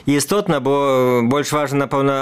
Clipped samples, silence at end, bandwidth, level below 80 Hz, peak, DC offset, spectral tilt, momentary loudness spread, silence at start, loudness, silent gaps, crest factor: under 0.1%; 0 s; 16 kHz; -52 dBFS; -6 dBFS; under 0.1%; -5 dB/octave; 3 LU; 0.05 s; -17 LUFS; none; 10 dB